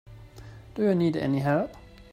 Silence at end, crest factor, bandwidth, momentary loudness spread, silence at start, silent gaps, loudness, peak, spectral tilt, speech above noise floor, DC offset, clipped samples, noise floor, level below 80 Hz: 0.1 s; 16 dB; 15 kHz; 23 LU; 0.05 s; none; -26 LUFS; -12 dBFS; -8.5 dB/octave; 21 dB; under 0.1%; under 0.1%; -46 dBFS; -54 dBFS